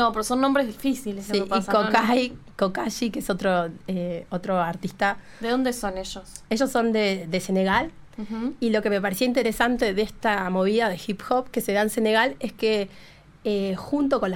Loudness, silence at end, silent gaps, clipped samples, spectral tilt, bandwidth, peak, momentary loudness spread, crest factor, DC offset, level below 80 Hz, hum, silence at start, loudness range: -24 LUFS; 0 s; none; under 0.1%; -5 dB/octave; 17 kHz; -4 dBFS; 9 LU; 20 dB; under 0.1%; -50 dBFS; none; 0 s; 3 LU